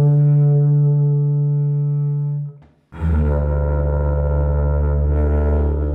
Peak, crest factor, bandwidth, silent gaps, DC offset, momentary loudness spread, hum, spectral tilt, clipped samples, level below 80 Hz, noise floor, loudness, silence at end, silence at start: -8 dBFS; 8 dB; 2.5 kHz; none; under 0.1%; 7 LU; none; -13 dB/octave; under 0.1%; -22 dBFS; -39 dBFS; -18 LUFS; 0 s; 0 s